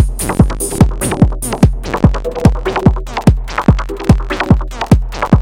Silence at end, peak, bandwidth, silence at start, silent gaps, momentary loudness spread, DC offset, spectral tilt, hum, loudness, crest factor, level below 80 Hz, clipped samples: 0 s; 0 dBFS; 17 kHz; 0 s; none; 1 LU; under 0.1%; -6.5 dB/octave; none; -14 LUFS; 12 dB; -18 dBFS; 1%